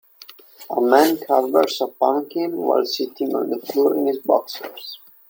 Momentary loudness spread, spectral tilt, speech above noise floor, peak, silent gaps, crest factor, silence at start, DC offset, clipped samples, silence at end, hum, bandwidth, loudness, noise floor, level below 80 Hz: 13 LU; -3.5 dB/octave; 26 dB; -2 dBFS; none; 20 dB; 0.6 s; under 0.1%; under 0.1%; 0.35 s; none; 17 kHz; -20 LUFS; -46 dBFS; -72 dBFS